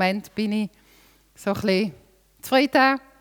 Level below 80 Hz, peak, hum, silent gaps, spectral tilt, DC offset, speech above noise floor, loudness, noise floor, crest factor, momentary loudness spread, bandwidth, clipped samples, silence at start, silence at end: -60 dBFS; -6 dBFS; none; none; -5 dB/octave; under 0.1%; 34 dB; -23 LUFS; -56 dBFS; 18 dB; 13 LU; 20 kHz; under 0.1%; 0 s; 0.2 s